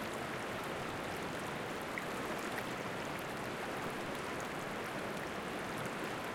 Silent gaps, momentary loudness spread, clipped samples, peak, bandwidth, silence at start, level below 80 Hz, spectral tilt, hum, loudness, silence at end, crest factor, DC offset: none; 1 LU; under 0.1%; -24 dBFS; 17 kHz; 0 s; -64 dBFS; -4 dB/octave; none; -40 LUFS; 0 s; 16 dB; under 0.1%